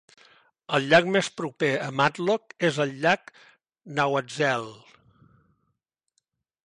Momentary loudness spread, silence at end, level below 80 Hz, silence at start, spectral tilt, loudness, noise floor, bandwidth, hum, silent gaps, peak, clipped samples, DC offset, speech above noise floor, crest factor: 9 LU; 1.9 s; -70 dBFS; 0.7 s; -4.5 dB/octave; -25 LUFS; -78 dBFS; 11.5 kHz; none; none; -6 dBFS; under 0.1%; under 0.1%; 54 dB; 20 dB